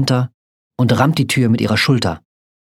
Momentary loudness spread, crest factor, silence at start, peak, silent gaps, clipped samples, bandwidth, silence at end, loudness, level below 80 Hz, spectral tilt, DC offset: 12 LU; 16 dB; 0 s; 0 dBFS; 0.34-0.71 s; under 0.1%; 15.5 kHz; 0.55 s; -16 LUFS; -50 dBFS; -5.5 dB/octave; under 0.1%